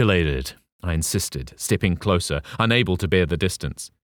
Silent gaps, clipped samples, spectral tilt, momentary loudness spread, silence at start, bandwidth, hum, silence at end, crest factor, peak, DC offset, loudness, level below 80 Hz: 0.72-0.79 s; under 0.1%; -4.5 dB/octave; 10 LU; 0 s; 19.5 kHz; none; 0.15 s; 18 dB; -4 dBFS; under 0.1%; -22 LUFS; -36 dBFS